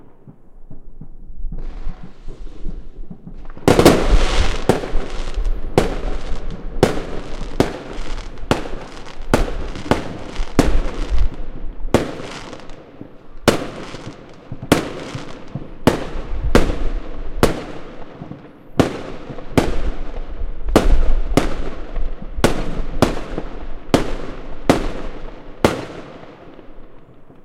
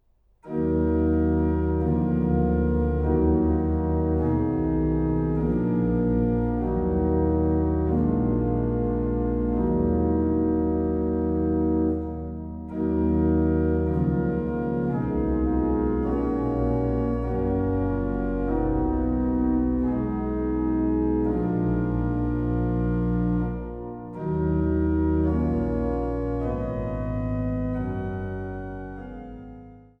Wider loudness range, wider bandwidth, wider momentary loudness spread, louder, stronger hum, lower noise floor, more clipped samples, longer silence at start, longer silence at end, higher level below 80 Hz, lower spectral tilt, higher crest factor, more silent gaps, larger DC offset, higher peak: about the same, 5 LU vs 3 LU; first, 16 kHz vs 3.5 kHz; first, 19 LU vs 7 LU; first, -21 LUFS vs -25 LUFS; neither; second, -40 dBFS vs -49 dBFS; neither; second, 0.05 s vs 0.45 s; second, 0.05 s vs 0.2 s; first, -24 dBFS vs -32 dBFS; second, -5.5 dB/octave vs -12 dB/octave; about the same, 18 dB vs 14 dB; neither; neither; first, 0 dBFS vs -10 dBFS